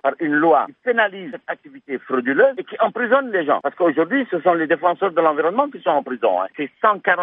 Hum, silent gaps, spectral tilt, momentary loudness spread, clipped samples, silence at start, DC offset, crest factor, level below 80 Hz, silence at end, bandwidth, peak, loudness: none; none; -9 dB/octave; 11 LU; under 0.1%; 0.05 s; under 0.1%; 16 dB; -78 dBFS; 0 s; 4.5 kHz; -2 dBFS; -19 LUFS